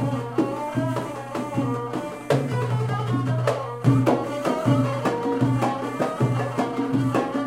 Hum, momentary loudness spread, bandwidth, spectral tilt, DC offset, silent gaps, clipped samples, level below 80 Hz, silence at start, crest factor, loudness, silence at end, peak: none; 6 LU; 14 kHz; -7.5 dB/octave; under 0.1%; none; under 0.1%; -56 dBFS; 0 s; 18 dB; -24 LUFS; 0 s; -6 dBFS